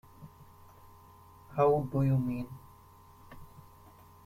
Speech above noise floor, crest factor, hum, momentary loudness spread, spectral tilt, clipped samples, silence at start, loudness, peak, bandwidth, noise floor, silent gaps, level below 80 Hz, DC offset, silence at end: 28 dB; 20 dB; none; 26 LU; -10 dB/octave; under 0.1%; 0.2 s; -30 LUFS; -14 dBFS; 15.5 kHz; -57 dBFS; none; -60 dBFS; under 0.1%; 0.8 s